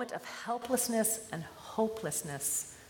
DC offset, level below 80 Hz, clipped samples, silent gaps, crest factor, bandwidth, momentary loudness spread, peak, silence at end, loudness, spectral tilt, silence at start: under 0.1%; -70 dBFS; under 0.1%; none; 18 dB; 17.5 kHz; 11 LU; -18 dBFS; 0 s; -34 LUFS; -3 dB/octave; 0 s